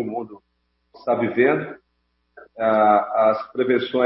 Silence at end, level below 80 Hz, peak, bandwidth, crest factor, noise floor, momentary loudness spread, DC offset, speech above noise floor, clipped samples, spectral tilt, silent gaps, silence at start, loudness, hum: 0 s; -68 dBFS; -4 dBFS; 5.8 kHz; 18 dB; -70 dBFS; 15 LU; under 0.1%; 50 dB; under 0.1%; -10.5 dB/octave; none; 0 s; -20 LUFS; 60 Hz at -55 dBFS